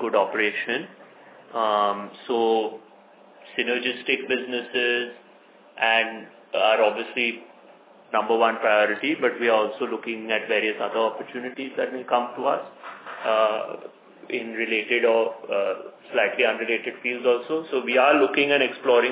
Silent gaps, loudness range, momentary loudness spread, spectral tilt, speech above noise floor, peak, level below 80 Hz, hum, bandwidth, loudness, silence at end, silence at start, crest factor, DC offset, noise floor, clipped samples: none; 4 LU; 12 LU; -7 dB/octave; 28 dB; -4 dBFS; -86 dBFS; none; 4 kHz; -23 LUFS; 0 s; 0 s; 20 dB; under 0.1%; -52 dBFS; under 0.1%